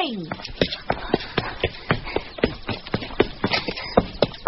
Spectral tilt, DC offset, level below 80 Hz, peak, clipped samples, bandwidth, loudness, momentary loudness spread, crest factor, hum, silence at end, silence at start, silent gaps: -3.5 dB/octave; under 0.1%; -40 dBFS; 0 dBFS; under 0.1%; 6 kHz; -25 LUFS; 7 LU; 24 dB; none; 0 s; 0 s; none